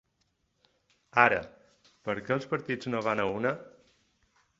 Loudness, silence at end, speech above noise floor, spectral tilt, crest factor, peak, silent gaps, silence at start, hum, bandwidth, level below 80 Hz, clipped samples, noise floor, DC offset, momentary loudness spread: -29 LUFS; 0.9 s; 47 dB; -6 dB/octave; 28 dB; -4 dBFS; none; 1.15 s; none; 7.8 kHz; -66 dBFS; under 0.1%; -75 dBFS; under 0.1%; 14 LU